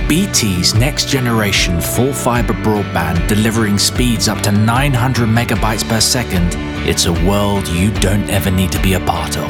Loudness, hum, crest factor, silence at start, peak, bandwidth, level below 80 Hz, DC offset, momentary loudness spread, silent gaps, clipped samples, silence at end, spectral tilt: -14 LUFS; none; 14 dB; 0 s; 0 dBFS; 19 kHz; -24 dBFS; 0.2%; 4 LU; none; under 0.1%; 0 s; -4.5 dB/octave